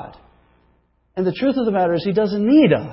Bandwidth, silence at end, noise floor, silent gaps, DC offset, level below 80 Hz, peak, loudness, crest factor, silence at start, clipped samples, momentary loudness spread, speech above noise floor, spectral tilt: 5.8 kHz; 0 s; -61 dBFS; none; under 0.1%; -54 dBFS; -4 dBFS; -18 LUFS; 14 dB; 0 s; under 0.1%; 12 LU; 44 dB; -12 dB/octave